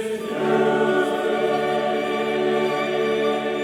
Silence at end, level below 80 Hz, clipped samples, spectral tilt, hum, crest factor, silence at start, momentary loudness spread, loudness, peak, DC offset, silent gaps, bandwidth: 0 s; -64 dBFS; under 0.1%; -5 dB/octave; none; 14 dB; 0 s; 4 LU; -22 LUFS; -8 dBFS; under 0.1%; none; 16 kHz